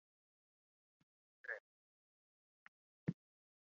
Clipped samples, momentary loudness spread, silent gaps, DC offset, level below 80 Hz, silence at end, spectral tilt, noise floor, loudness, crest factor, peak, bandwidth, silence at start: under 0.1%; 21 LU; 1.60-3.07 s; under 0.1%; -88 dBFS; 0.5 s; -7.5 dB/octave; under -90 dBFS; -50 LUFS; 28 dB; -28 dBFS; 7 kHz; 1.45 s